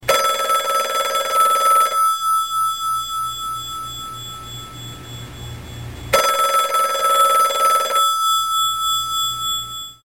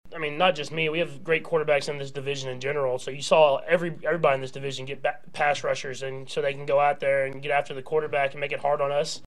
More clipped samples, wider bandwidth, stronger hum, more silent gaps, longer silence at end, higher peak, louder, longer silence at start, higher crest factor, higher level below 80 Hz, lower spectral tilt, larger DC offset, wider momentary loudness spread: neither; first, 17 kHz vs 12 kHz; neither; neither; about the same, 0.1 s vs 0.1 s; about the same, -4 dBFS vs -6 dBFS; first, -17 LUFS vs -26 LUFS; about the same, 0 s vs 0.05 s; second, 14 dB vs 20 dB; first, -48 dBFS vs -66 dBFS; second, -1 dB/octave vs -4 dB/octave; second, 0.3% vs 1%; first, 18 LU vs 9 LU